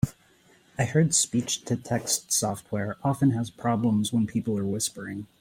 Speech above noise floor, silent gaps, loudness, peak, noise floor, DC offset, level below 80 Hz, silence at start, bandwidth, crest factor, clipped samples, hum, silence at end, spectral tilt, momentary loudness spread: 33 dB; none; -26 LUFS; -8 dBFS; -60 dBFS; under 0.1%; -58 dBFS; 0.05 s; 16.5 kHz; 18 dB; under 0.1%; none; 0.15 s; -4.5 dB/octave; 9 LU